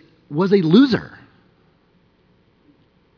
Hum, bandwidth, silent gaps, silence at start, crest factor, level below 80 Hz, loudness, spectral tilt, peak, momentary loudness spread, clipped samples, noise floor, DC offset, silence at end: none; 5.4 kHz; none; 0.3 s; 20 dB; -60 dBFS; -16 LUFS; -8.5 dB/octave; 0 dBFS; 15 LU; under 0.1%; -58 dBFS; under 0.1%; 2.1 s